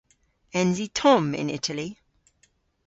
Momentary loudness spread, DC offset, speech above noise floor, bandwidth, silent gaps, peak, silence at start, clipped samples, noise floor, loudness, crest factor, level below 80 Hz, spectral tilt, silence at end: 12 LU; under 0.1%; 43 dB; 8.2 kHz; none; -6 dBFS; 0.55 s; under 0.1%; -66 dBFS; -24 LUFS; 20 dB; -62 dBFS; -5 dB/octave; 0.95 s